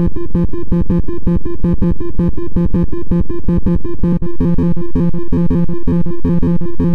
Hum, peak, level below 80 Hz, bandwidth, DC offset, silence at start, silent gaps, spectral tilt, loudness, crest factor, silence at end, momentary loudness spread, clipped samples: none; -4 dBFS; -22 dBFS; 3.8 kHz; 30%; 0 s; none; -11.5 dB/octave; -17 LUFS; 10 dB; 0 s; 3 LU; under 0.1%